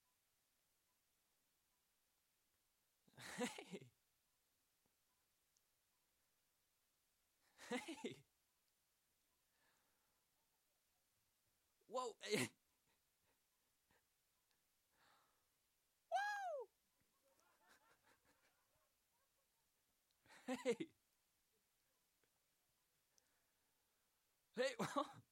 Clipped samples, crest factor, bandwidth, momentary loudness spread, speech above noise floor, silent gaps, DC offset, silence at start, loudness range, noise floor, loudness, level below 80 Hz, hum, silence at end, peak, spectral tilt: under 0.1%; 26 dB; 16 kHz; 15 LU; 39 dB; none; under 0.1%; 3.15 s; 6 LU; -86 dBFS; -48 LUFS; under -90 dBFS; none; 0.1 s; -28 dBFS; -3.5 dB/octave